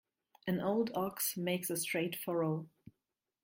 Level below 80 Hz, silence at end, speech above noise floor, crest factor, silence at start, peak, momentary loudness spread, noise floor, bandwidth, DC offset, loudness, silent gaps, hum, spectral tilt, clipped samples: -76 dBFS; 0.55 s; 53 dB; 16 dB; 0.45 s; -20 dBFS; 6 LU; -89 dBFS; 16.5 kHz; under 0.1%; -36 LUFS; none; none; -4.5 dB/octave; under 0.1%